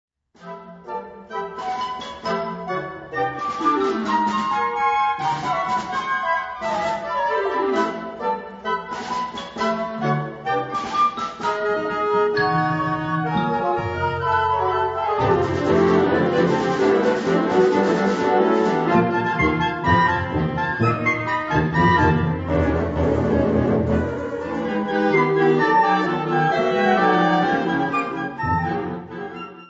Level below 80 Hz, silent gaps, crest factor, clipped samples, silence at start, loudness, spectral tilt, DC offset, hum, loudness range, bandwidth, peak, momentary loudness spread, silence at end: -42 dBFS; none; 18 dB; under 0.1%; 0.4 s; -21 LUFS; -7 dB/octave; under 0.1%; none; 6 LU; 8 kHz; -4 dBFS; 10 LU; 0.05 s